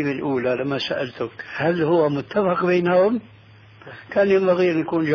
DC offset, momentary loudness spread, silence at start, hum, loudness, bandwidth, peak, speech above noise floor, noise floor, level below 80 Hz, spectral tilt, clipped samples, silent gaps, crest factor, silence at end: under 0.1%; 11 LU; 0 s; none; -21 LUFS; 5.4 kHz; -8 dBFS; 27 dB; -47 dBFS; -60 dBFS; -7.5 dB/octave; under 0.1%; none; 14 dB; 0 s